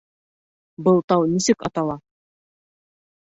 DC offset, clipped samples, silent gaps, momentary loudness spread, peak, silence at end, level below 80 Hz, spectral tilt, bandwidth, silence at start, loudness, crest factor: under 0.1%; under 0.1%; 1.04-1.08 s; 9 LU; -4 dBFS; 1.25 s; -58 dBFS; -5.5 dB/octave; 8.2 kHz; 0.8 s; -20 LUFS; 18 dB